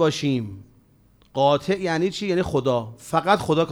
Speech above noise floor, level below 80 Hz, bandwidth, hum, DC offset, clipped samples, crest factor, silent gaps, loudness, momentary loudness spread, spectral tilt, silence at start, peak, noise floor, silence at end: 35 dB; -52 dBFS; over 20 kHz; none; under 0.1%; under 0.1%; 18 dB; none; -23 LUFS; 7 LU; -6 dB/octave; 0 s; -4 dBFS; -57 dBFS; 0 s